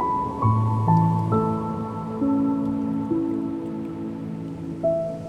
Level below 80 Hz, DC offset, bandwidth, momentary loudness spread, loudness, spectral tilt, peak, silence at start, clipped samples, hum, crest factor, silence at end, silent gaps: -50 dBFS; under 0.1%; 8 kHz; 11 LU; -24 LUFS; -10.5 dB/octave; -8 dBFS; 0 s; under 0.1%; none; 16 dB; 0 s; none